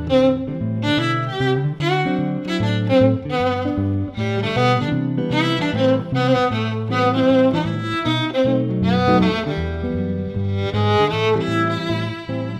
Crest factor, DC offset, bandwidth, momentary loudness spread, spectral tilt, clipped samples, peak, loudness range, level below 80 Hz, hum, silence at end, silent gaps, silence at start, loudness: 16 dB; under 0.1%; 10 kHz; 7 LU; -7 dB/octave; under 0.1%; -4 dBFS; 2 LU; -42 dBFS; none; 0 s; none; 0 s; -19 LUFS